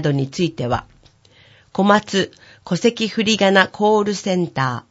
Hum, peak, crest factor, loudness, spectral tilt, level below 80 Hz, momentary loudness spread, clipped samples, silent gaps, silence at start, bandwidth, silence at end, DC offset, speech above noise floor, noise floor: none; 0 dBFS; 18 dB; -18 LUFS; -5 dB/octave; -52 dBFS; 9 LU; under 0.1%; none; 0 s; 8 kHz; 0.1 s; under 0.1%; 33 dB; -51 dBFS